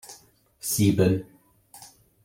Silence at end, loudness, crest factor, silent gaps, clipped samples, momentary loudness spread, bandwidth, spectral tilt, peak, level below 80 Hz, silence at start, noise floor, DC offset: 0.4 s; -24 LUFS; 20 dB; none; under 0.1%; 26 LU; 16.5 kHz; -5.5 dB/octave; -8 dBFS; -58 dBFS; 0.1 s; -56 dBFS; under 0.1%